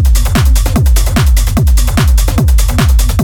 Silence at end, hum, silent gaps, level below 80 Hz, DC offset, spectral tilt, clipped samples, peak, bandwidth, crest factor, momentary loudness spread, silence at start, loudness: 0 s; none; none; -8 dBFS; under 0.1%; -5 dB/octave; under 0.1%; 0 dBFS; 18 kHz; 8 dB; 0 LU; 0 s; -11 LUFS